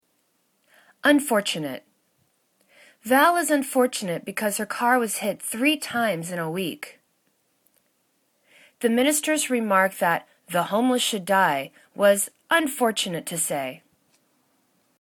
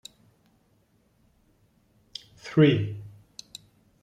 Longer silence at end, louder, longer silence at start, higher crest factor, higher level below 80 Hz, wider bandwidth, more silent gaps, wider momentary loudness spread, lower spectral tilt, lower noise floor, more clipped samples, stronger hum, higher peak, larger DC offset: first, 1.25 s vs 0.95 s; about the same, -23 LUFS vs -23 LUFS; second, 1.05 s vs 2.45 s; about the same, 20 dB vs 22 dB; second, -72 dBFS vs -64 dBFS; first, 19 kHz vs 10 kHz; neither; second, 10 LU vs 26 LU; second, -3 dB/octave vs -7 dB/octave; about the same, -69 dBFS vs -66 dBFS; neither; neither; about the same, -6 dBFS vs -8 dBFS; neither